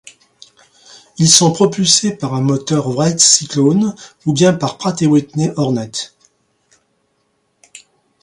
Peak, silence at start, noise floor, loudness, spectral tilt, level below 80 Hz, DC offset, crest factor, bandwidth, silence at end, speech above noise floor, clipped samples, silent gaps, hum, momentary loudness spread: 0 dBFS; 1.2 s; -64 dBFS; -13 LUFS; -4 dB/octave; -56 dBFS; under 0.1%; 16 dB; 16 kHz; 0.45 s; 50 dB; under 0.1%; none; none; 11 LU